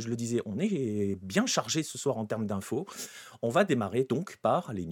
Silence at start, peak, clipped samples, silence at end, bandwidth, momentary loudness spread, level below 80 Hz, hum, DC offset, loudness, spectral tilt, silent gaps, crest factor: 0 s; -10 dBFS; under 0.1%; 0 s; 18 kHz; 8 LU; -72 dBFS; none; under 0.1%; -30 LUFS; -5 dB/octave; none; 20 dB